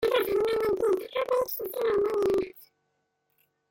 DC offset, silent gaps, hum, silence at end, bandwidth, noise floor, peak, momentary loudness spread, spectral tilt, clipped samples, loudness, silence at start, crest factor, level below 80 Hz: under 0.1%; none; none; 1.1 s; 17 kHz; -77 dBFS; -12 dBFS; 4 LU; -4.5 dB/octave; under 0.1%; -27 LUFS; 0 s; 16 dB; -60 dBFS